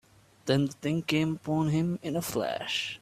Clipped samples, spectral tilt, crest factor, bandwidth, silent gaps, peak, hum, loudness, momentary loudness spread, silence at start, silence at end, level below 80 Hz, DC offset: under 0.1%; -5.5 dB/octave; 18 dB; 15.5 kHz; none; -12 dBFS; none; -29 LUFS; 4 LU; 0.45 s; 0.05 s; -62 dBFS; under 0.1%